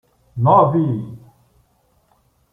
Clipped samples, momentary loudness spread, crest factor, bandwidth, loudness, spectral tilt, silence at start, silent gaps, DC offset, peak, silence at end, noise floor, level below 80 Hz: under 0.1%; 22 LU; 18 dB; 3.7 kHz; -16 LUFS; -11 dB/octave; 0.35 s; none; under 0.1%; -2 dBFS; 1.35 s; -61 dBFS; -56 dBFS